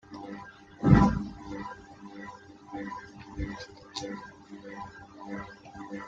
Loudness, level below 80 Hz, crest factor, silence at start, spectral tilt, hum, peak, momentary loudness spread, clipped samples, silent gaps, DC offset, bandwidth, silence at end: -30 LUFS; -44 dBFS; 28 dB; 0.1 s; -7.5 dB/octave; none; -4 dBFS; 24 LU; under 0.1%; none; under 0.1%; 7.8 kHz; 0 s